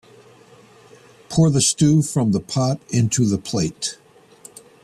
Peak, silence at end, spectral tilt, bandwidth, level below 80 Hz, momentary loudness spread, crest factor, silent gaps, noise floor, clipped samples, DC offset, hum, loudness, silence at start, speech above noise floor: -6 dBFS; 0.9 s; -5 dB/octave; 13.5 kHz; -52 dBFS; 9 LU; 16 dB; none; -48 dBFS; under 0.1%; under 0.1%; none; -19 LUFS; 1.3 s; 30 dB